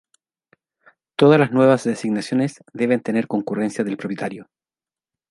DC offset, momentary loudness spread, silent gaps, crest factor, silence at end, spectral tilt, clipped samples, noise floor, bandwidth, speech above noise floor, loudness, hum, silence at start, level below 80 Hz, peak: under 0.1%; 13 LU; none; 20 dB; 0.9 s; -6.5 dB/octave; under 0.1%; under -90 dBFS; 11.5 kHz; over 71 dB; -20 LUFS; none; 1.2 s; -66 dBFS; -2 dBFS